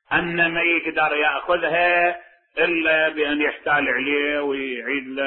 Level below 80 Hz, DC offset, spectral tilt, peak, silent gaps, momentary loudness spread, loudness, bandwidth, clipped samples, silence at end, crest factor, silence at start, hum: -56 dBFS; under 0.1%; -9 dB/octave; -6 dBFS; none; 7 LU; -20 LUFS; 4.2 kHz; under 0.1%; 0 s; 14 dB; 0.1 s; none